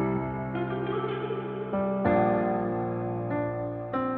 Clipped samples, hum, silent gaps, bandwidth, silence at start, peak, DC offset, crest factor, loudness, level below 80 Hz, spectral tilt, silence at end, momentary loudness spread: under 0.1%; none; none; 4.5 kHz; 0 s; -10 dBFS; under 0.1%; 18 dB; -29 LUFS; -54 dBFS; -11 dB/octave; 0 s; 8 LU